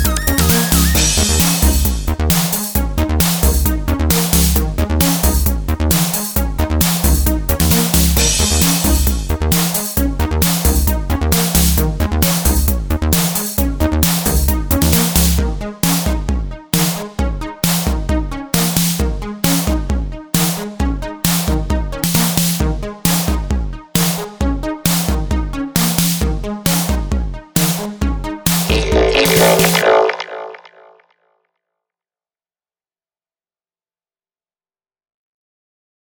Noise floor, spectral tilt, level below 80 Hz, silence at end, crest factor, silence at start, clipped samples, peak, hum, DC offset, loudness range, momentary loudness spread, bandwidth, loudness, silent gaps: under -90 dBFS; -4 dB/octave; -20 dBFS; 5.55 s; 16 dB; 0 s; under 0.1%; 0 dBFS; none; under 0.1%; 4 LU; 8 LU; over 20 kHz; -15 LUFS; none